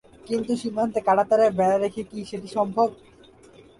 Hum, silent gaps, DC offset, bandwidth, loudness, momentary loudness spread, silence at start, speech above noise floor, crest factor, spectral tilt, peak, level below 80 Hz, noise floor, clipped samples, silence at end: none; none; under 0.1%; 11.5 kHz; -23 LUFS; 12 LU; 0.25 s; 28 dB; 16 dB; -6 dB/octave; -8 dBFS; -60 dBFS; -51 dBFS; under 0.1%; 0.85 s